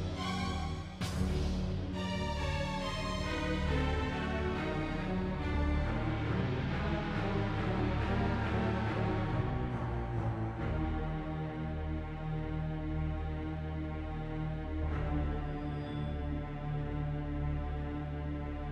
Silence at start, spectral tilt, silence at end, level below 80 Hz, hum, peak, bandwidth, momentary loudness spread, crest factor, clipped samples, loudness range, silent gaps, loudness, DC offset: 0 s; -7 dB/octave; 0 s; -40 dBFS; none; -20 dBFS; 11 kHz; 6 LU; 14 dB; under 0.1%; 4 LU; none; -36 LUFS; under 0.1%